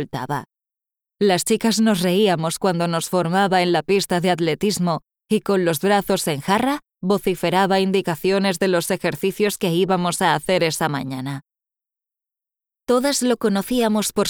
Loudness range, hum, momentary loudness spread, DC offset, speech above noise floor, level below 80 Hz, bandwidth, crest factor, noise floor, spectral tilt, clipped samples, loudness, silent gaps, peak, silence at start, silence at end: 4 LU; none; 6 LU; under 0.1%; 70 dB; -56 dBFS; over 20 kHz; 16 dB; -89 dBFS; -4.5 dB/octave; under 0.1%; -20 LUFS; none; -4 dBFS; 0 s; 0 s